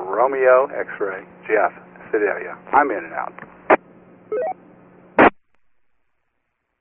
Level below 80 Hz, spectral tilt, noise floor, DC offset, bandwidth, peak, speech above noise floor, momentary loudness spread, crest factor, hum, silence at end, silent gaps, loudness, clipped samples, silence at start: -58 dBFS; 1.5 dB/octave; -73 dBFS; under 0.1%; 3.9 kHz; -2 dBFS; 53 dB; 14 LU; 20 dB; none; 1.5 s; none; -20 LUFS; under 0.1%; 0 s